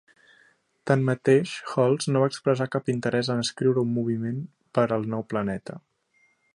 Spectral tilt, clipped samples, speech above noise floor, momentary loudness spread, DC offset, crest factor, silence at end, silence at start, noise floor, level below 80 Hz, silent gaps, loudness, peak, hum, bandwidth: -6 dB/octave; under 0.1%; 42 dB; 10 LU; under 0.1%; 20 dB; 0.75 s; 0.85 s; -67 dBFS; -64 dBFS; none; -25 LUFS; -6 dBFS; none; 11.5 kHz